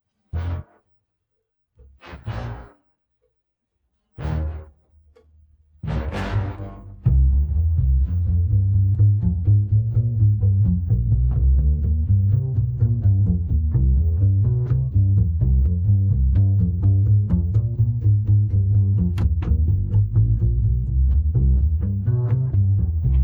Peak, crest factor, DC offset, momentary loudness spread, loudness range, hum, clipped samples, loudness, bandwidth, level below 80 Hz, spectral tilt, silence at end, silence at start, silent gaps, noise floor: -8 dBFS; 12 dB; under 0.1%; 10 LU; 15 LU; none; under 0.1%; -20 LUFS; 3.6 kHz; -24 dBFS; -10.5 dB/octave; 0 s; 0.35 s; none; -76 dBFS